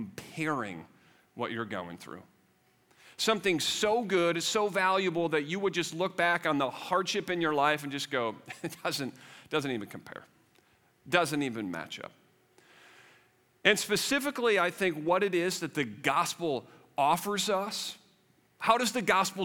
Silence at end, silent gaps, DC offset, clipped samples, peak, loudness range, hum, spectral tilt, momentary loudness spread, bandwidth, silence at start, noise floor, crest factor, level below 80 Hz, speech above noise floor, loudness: 0 s; none; under 0.1%; under 0.1%; -6 dBFS; 7 LU; none; -3.5 dB/octave; 14 LU; 18.5 kHz; 0 s; -68 dBFS; 24 dB; -74 dBFS; 38 dB; -30 LUFS